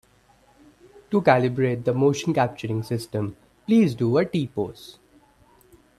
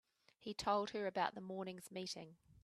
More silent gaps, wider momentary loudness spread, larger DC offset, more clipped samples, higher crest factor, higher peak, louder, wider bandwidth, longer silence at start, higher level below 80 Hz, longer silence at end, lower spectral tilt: neither; about the same, 12 LU vs 12 LU; neither; neither; about the same, 22 dB vs 22 dB; first, -2 dBFS vs -22 dBFS; first, -23 LUFS vs -43 LUFS; about the same, 13.5 kHz vs 13.5 kHz; first, 1.1 s vs 0.4 s; first, -60 dBFS vs -76 dBFS; first, 1.1 s vs 0.05 s; first, -7 dB/octave vs -4 dB/octave